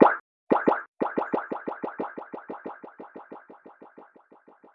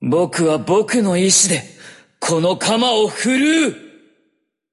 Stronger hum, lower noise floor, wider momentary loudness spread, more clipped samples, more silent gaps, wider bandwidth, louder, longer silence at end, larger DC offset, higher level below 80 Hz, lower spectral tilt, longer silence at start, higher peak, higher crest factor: neither; second, -56 dBFS vs -67 dBFS; first, 26 LU vs 7 LU; neither; first, 0.20-0.47 s, 0.88-0.93 s vs none; second, 5.8 kHz vs 11.5 kHz; second, -29 LUFS vs -16 LUFS; second, 0.7 s vs 0.85 s; neither; second, -70 dBFS vs -62 dBFS; first, -9 dB/octave vs -3.5 dB/octave; about the same, 0 s vs 0 s; about the same, -2 dBFS vs -2 dBFS; first, 26 dB vs 16 dB